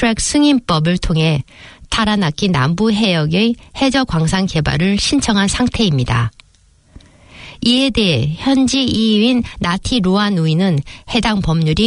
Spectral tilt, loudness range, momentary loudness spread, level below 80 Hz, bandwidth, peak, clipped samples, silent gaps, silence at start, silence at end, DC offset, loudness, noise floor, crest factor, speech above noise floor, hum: -5 dB/octave; 2 LU; 5 LU; -32 dBFS; 11 kHz; -2 dBFS; under 0.1%; none; 0 s; 0 s; under 0.1%; -15 LUFS; -51 dBFS; 14 dB; 36 dB; none